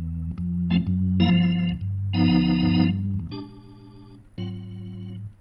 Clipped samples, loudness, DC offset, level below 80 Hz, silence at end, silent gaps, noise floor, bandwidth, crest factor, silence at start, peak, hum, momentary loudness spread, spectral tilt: under 0.1%; -23 LUFS; under 0.1%; -42 dBFS; 0.1 s; none; -46 dBFS; 5.6 kHz; 16 dB; 0 s; -8 dBFS; none; 17 LU; -9.5 dB/octave